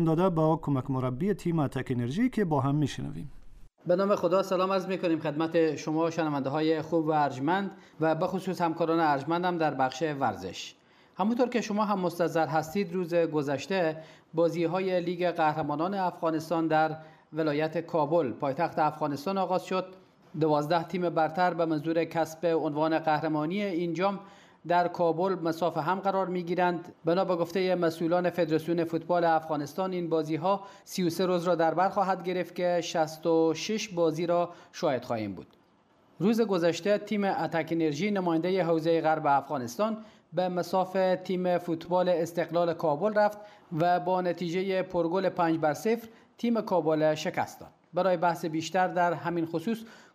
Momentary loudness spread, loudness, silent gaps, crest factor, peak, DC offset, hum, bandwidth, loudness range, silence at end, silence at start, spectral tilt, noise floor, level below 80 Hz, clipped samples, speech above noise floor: 6 LU; -28 LUFS; none; 14 dB; -14 dBFS; under 0.1%; none; 15.5 kHz; 2 LU; 0.15 s; 0 s; -6.5 dB/octave; -64 dBFS; -62 dBFS; under 0.1%; 36 dB